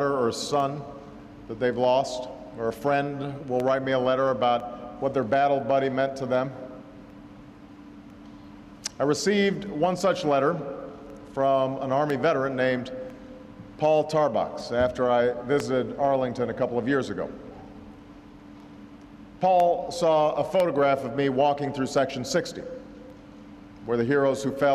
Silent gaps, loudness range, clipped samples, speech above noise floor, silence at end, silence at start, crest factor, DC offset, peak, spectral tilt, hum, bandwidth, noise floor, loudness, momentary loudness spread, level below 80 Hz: none; 5 LU; under 0.1%; 22 dB; 0 s; 0 s; 14 dB; under 0.1%; -12 dBFS; -5.5 dB/octave; none; 13.5 kHz; -47 dBFS; -25 LUFS; 23 LU; -56 dBFS